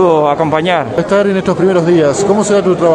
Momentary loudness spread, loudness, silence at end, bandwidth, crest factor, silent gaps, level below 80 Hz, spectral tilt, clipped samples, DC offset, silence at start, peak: 3 LU; -11 LUFS; 0 s; 10.5 kHz; 10 dB; none; -46 dBFS; -6 dB/octave; under 0.1%; under 0.1%; 0 s; 0 dBFS